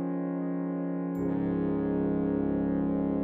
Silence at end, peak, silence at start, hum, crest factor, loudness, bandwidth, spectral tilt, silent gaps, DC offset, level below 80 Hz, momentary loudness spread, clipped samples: 0 s; -18 dBFS; 0 s; none; 12 dB; -30 LUFS; 3.6 kHz; -11.5 dB/octave; none; under 0.1%; -52 dBFS; 4 LU; under 0.1%